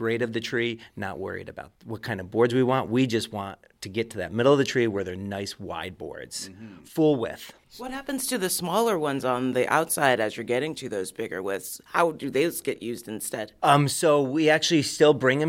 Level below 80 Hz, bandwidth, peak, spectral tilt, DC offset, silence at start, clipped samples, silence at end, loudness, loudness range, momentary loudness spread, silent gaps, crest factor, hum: -62 dBFS; 16.5 kHz; -6 dBFS; -4.5 dB/octave; under 0.1%; 0 s; under 0.1%; 0 s; -25 LUFS; 5 LU; 15 LU; none; 20 dB; none